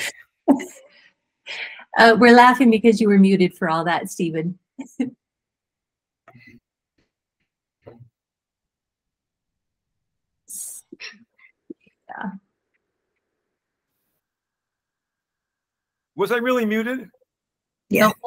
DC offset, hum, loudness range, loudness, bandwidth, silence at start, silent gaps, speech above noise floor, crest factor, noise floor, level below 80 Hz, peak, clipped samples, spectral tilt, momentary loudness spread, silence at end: under 0.1%; none; 25 LU; -17 LUFS; 16 kHz; 0 s; none; 71 dB; 22 dB; -88 dBFS; -66 dBFS; 0 dBFS; under 0.1%; -5.5 dB/octave; 24 LU; 0 s